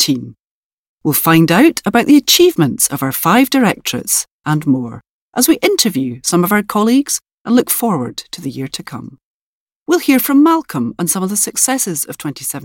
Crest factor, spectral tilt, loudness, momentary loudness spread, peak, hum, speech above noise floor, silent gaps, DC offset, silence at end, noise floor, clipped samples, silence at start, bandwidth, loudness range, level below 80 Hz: 14 dB; -3.5 dB/octave; -13 LUFS; 14 LU; 0 dBFS; none; over 76 dB; 0.40-0.98 s, 4.31-4.40 s, 5.09-5.32 s, 7.33-7.45 s, 9.25-9.86 s; under 0.1%; 0 s; under -90 dBFS; under 0.1%; 0 s; 17 kHz; 5 LU; -54 dBFS